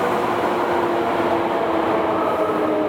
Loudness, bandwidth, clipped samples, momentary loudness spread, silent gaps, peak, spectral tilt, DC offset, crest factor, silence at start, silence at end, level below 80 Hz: -20 LUFS; 18 kHz; under 0.1%; 1 LU; none; -6 dBFS; -6 dB/octave; under 0.1%; 14 dB; 0 s; 0 s; -52 dBFS